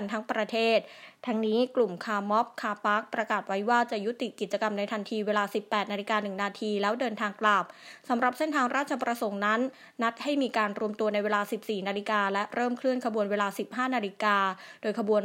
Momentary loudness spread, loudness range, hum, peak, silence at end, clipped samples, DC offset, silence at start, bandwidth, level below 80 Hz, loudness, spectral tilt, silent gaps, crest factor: 6 LU; 1 LU; none; -10 dBFS; 0 s; under 0.1%; under 0.1%; 0 s; 16 kHz; -84 dBFS; -29 LUFS; -5 dB/octave; none; 20 dB